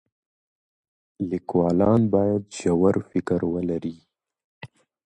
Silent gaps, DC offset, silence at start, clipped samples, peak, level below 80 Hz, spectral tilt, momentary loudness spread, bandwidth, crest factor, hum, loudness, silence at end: 4.44-4.61 s; under 0.1%; 1.2 s; under 0.1%; -6 dBFS; -50 dBFS; -8 dB/octave; 10 LU; 9.4 kHz; 18 dB; none; -23 LUFS; 0.4 s